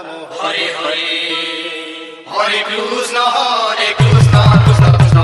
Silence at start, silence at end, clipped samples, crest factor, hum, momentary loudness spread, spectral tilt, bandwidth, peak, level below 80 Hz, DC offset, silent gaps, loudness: 0 s; 0 s; 0.4%; 12 dB; none; 14 LU; -5.5 dB/octave; 11.5 kHz; 0 dBFS; -32 dBFS; under 0.1%; none; -12 LUFS